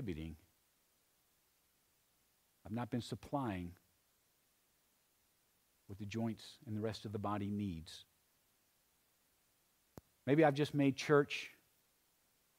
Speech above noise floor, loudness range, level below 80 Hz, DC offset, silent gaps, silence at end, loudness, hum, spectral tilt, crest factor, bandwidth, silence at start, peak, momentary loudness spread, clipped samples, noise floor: 39 dB; 12 LU; -70 dBFS; under 0.1%; none; 1.05 s; -38 LUFS; none; -6.5 dB/octave; 24 dB; 16 kHz; 0 s; -18 dBFS; 20 LU; under 0.1%; -77 dBFS